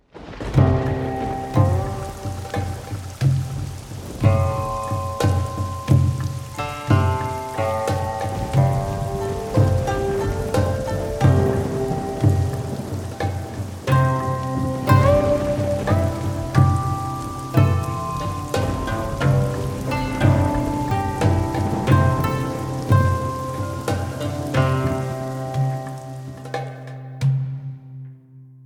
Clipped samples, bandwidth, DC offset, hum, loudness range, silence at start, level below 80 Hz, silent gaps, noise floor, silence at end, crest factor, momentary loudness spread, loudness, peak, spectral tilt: under 0.1%; 18.5 kHz; under 0.1%; none; 4 LU; 0.15 s; -36 dBFS; none; -45 dBFS; 0 s; 20 dB; 12 LU; -22 LUFS; 0 dBFS; -7 dB/octave